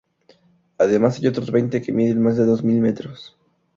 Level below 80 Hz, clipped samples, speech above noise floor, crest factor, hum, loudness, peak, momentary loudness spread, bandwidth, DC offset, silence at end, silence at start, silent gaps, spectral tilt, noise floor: -58 dBFS; under 0.1%; 38 dB; 16 dB; none; -19 LUFS; -4 dBFS; 8 LU; 7.2 kHz; under 0.1%; 0.55 s; 0.8 s; none; -8 dB/octave; -56 dBFS